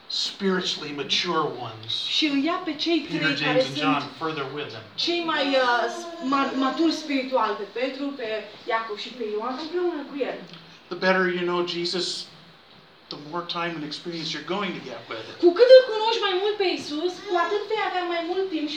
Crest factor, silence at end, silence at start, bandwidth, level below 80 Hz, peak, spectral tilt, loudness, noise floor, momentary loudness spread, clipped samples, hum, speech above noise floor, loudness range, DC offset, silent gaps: 24 dB; 0 s; 0.1 s; 9.6 kHz; -74 dBFS; -2 dBFS; -4 dB/octave; -24 LUFS; -52 dBFS; 11 LU; under 0.1%; none; 27 dB; 8 LU; under 0.1%; none